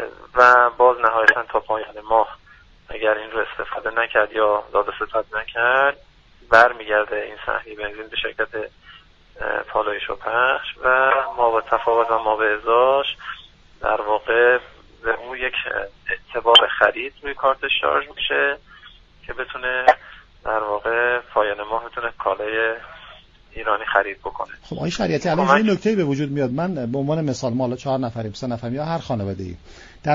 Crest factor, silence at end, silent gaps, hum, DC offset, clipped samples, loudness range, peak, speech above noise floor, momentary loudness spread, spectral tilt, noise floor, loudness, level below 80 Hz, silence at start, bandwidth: 20 dB; 0 s; none; none; under 0.1%; under 0.1%; 6 LU; 0 dBFS; 27 dB; 13 LU; -5 dB/octave; -47 dBFS; -20 LUFS; -50 dBFS; 0 s; 7.6 kHz